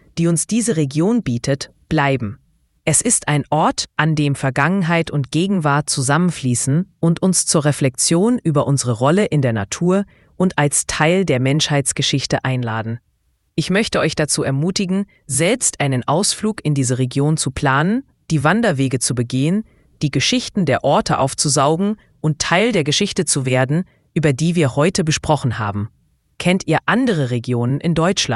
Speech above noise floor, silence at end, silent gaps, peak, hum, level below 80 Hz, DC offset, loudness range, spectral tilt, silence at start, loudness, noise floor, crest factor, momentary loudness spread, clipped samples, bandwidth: 47 dB; 0 s; none; 0 dBFS; none; -46 dBFS; under 0.1%; 2 LU; -4.5 dB/octave; 0.15 s; -17 LUFS; -64 dBFS; 18 dB; 6 LU; under 0.1%; 12 kHz